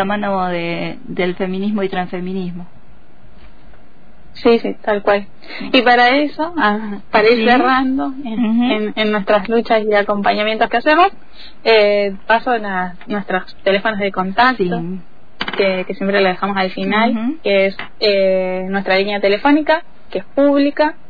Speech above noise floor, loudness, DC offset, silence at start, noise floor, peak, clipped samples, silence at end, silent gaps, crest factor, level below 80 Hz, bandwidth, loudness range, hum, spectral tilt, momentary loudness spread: 30 dB; -16 LUFS; 4%; 0 s; -46 dBFS; 0 dBFS; under 0.1%; 0.15 s; none; 16 dB; -48 dBFS; 5 kHz; 7 LU; none; -7.5 dB/octave; 11 LU